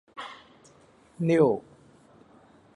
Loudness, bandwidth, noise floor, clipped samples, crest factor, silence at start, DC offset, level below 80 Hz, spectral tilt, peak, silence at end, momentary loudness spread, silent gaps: -25 LUFS; 11 kHz; -58 dBFS; under 0.1%; 22 dB; 0.15 s; under 0.1%; -70 dBFS; -8 dB/octave; -8 dBFS; 1.15 s; 20 LU; none